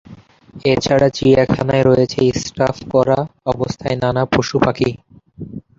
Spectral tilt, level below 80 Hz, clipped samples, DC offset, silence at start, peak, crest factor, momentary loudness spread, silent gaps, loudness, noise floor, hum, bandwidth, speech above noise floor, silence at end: -6 dB/octave; -42 dBFS; under 0.1%; under 0.1%; 0.1 s; -2 dBFS; 16 dB; 9 LU; none; -16 LUFS; -41 dBFS; none; 7.8 kHz; 26 dB; 0.2 s